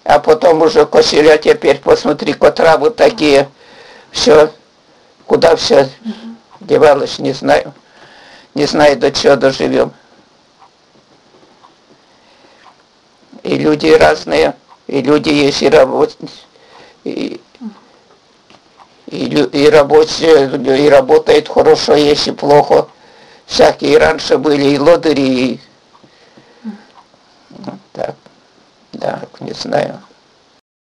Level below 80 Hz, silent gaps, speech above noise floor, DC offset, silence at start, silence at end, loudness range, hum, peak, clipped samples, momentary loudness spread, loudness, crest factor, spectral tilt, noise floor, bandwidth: -44 dBFS; none; 39 dB; under 0.1%; 0.05 s; 0.95 s; 14 LU; none; 0 dBFS; under 0.1%; 19 LU; -11 LUFS; 12 dB; -4.5 dB/octave; -49 dBFS; 11.5 kHz